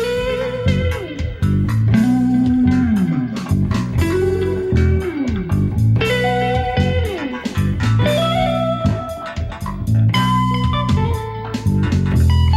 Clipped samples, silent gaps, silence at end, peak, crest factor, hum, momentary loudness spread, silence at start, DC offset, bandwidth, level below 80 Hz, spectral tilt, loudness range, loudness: under 0.1%; none; 0 s; -4 dBFS; 12 dB; none; 8 LU; 0 s; under 0.1%; 15 kHz; -28 dBFS; -7 dB/octave; 2 LU; -18 LUFS